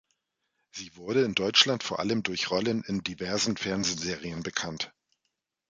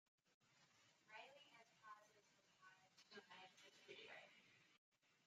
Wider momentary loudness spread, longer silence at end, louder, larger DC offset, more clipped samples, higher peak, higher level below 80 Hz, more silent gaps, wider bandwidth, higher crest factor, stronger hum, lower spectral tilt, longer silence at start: first, 15 LU vs 7 LU; first, 0.8 s vs 0 s; first, -28 LUFS vs -64 LUFS; neither; neither; first, -6 dBFS vs -46 dBFS; first, -60 dBFS vs under -90 dBFS; second, none vs 0.34-0.41 s, 4.78-4.92 s; about the same, 9.6 kHz vs 8.8 kHz; about the same, 26 dB vs 22 dB; neither; about the same, -3 dB/octave vs -2 dB/octave; first, 0.75 s vs 0.25 s